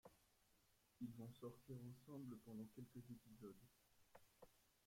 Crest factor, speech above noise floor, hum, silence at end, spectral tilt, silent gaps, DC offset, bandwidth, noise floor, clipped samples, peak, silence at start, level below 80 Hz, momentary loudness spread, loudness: 18 dB; 22 dB; none; 0 s; -7 dB/octave; none; under 0.1%; 16.5 kHz; -80 dBFS; under 0.1%; -42 dBFS; 0.05 s; -84 dBFS; 6 LU; -59 LUFS